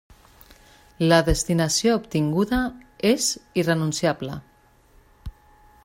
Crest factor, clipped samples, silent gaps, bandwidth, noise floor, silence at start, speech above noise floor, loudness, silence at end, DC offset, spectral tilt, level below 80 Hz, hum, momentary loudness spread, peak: 20 dB; under 0.1%; none; 16 kHz; -56 dBFS; 1 s; 34 dB; -22 LUFS; 0.55 s; under 0.1%; -4.5 dB/octave; -40 dBFS; none; 20 LU; -4 dBFS